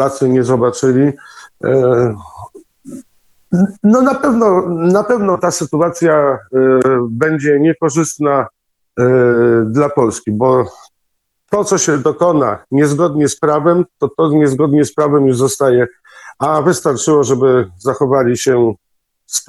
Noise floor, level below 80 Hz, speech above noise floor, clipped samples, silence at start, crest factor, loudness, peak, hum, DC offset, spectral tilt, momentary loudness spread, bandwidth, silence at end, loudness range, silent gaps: -68 dBFS; -52 dBFS; 55 dB; under 0.1%; 0 s; 12 dB; -13 LUFS; 0 dBFS; none; under 0.1%; -6 dB/octave; 7 LU; 12.5 kHz; 0.05 s; 2 LU; none